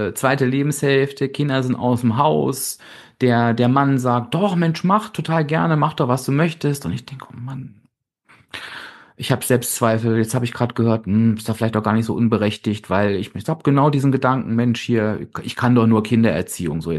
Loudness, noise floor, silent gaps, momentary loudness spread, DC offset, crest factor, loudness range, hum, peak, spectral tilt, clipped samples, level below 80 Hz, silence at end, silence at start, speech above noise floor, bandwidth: -19 LUFS; -59 dBFS; none; 12 LU; under 0.1%; 18 dB; 5 LU; none; -2 dBFS; -6 dB/octave; under 0.1%; -54 dBFS; 0 s; 0 s; 40 dB; 12.5 kHz